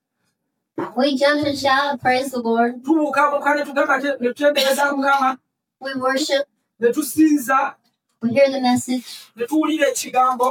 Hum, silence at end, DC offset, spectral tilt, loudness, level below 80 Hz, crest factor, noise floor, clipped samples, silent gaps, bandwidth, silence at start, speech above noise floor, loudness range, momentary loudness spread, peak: none; 0 s; under 0.1%; -3 dB/octave; -19 LUFS; -68 dBFS; 16 dB; -73 dBFS; under 0.1%; none; 18 kHz; 0.75 s; 55 dB; 1 LU; 10 LU; -4 dBFS